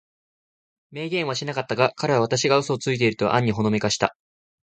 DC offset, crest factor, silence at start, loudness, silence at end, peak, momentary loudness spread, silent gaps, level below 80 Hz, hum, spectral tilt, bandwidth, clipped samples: under 0.1%; 20 dB; 0.9 s; -22 LUFS; 0.6 s; -4 dBFS; 7 LU; none; -58 dBFS; none; -4.5 dB/octave; 9.4 kHz; under 0.1%